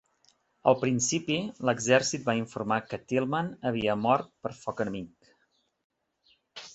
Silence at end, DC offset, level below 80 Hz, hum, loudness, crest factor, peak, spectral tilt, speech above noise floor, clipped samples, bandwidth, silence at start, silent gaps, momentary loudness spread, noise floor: 0 s; under 0.1%; -64 dBFS; none; -28 LUFS; 24 dB; -6 dBFS; -4 dB/octave; 45 dB; under 0.1%; 8.2 kHz; 0.65 s; 5.84-5.90 s; 13 LU; -73 dBFS